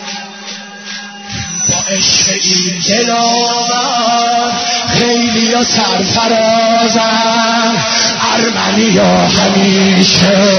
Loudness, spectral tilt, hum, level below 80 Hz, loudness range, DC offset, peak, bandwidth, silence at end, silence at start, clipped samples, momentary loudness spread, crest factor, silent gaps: -10 LUFS; -3 dB/octave; none; -44 dBFS; 2 LU; under 0.1%; 0 dBFS; 6.6 kHz; 0 s; 0 s; under 0.1%; 15 LU; 12 dB; none